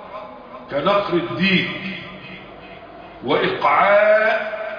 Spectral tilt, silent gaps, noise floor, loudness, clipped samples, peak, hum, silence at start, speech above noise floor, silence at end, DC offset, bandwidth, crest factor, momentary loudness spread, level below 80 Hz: -7 dB/octave; none; -39 dBFS; -18 LUFS; under 0.1%; -4 dBFS; none; 0 s; 21 dB; 0 s; under 0.1%; 5.2 kHz; 16 dB; 24 LU; -56 dBFS